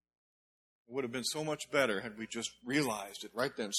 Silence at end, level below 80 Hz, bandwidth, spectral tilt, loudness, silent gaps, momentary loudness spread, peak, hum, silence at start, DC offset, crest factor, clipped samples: 0 s; -74 dBFS; 16 kHz; -3 dB/octave; -36 LUFS; none; 9 LU; -16 dBFS; none; 0.9 s; under 0.1%; 22 dB; under 0.1%